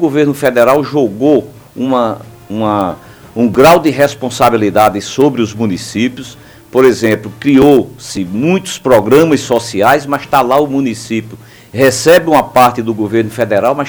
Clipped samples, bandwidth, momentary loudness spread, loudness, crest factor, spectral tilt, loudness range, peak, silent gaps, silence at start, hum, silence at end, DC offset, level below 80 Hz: 0.6%; over 20 kHz; 12 LU; -11 LUFS; 10 dB; -5.5 dB/octave; 2 LU; 0 dBFS; none; 0 s; none; 0 s; under 0.1%; -44 dBFS